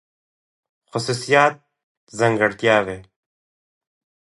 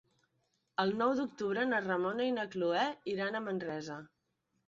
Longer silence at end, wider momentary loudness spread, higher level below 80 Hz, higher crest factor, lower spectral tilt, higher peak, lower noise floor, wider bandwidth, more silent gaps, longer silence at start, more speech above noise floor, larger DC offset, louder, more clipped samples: first, 1.35 s vs 0.6 s; first, 14 LU vs 9 LU; first, -60 dBFS vs -76 dBFS; about the same, 22 dB vs 18 dB; about the same, -4.5 dB/octave vs -3.5 dB/octave; first, -2 dBFS vs -18 dBFS; first, under -90 dBFS vs -81 dBFS; first, 11.5 kHz vs 7.6 kHz; first, 1.84-2.07 s vs none; first, 0.95 s vs 0.8 s; first, over 71 dB vs 47 dB; neither; first, -19 LUFS vs -34 LUFS; neither